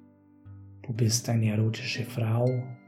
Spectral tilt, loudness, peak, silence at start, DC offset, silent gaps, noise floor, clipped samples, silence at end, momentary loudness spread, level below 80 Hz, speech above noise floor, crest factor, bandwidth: -5 dB/octave; -28 LUFS; -12 dBFS; 0.45 s; under 0.1%; none; -53 dBFS; under 0.1%; 0.1 s; 7 LU; -70 dBFS; 26 dB; 18 dB; 15 kHz